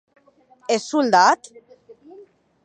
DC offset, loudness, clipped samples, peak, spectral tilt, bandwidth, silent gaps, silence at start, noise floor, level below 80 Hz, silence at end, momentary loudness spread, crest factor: under 0.1%; -18 LUFS; under 0.1%; -2 dBFS; -3 dB/octave; 9.6 kHz; none; 0.7 s; -55 dBFS; -76 dBFS; 1.3 s; 11 LU; 20 dB